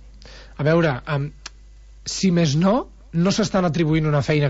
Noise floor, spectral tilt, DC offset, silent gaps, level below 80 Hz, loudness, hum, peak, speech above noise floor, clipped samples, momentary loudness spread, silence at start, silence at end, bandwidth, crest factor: -44 dBFS; -6 dB/octave; under 0.1%; none; -42 dBFS; -20 LUFS; none; -8 dBFS; 25 dB; under 0.1%; 15 LU; 0.05 s; 0 s; 8 kHz; 14 dB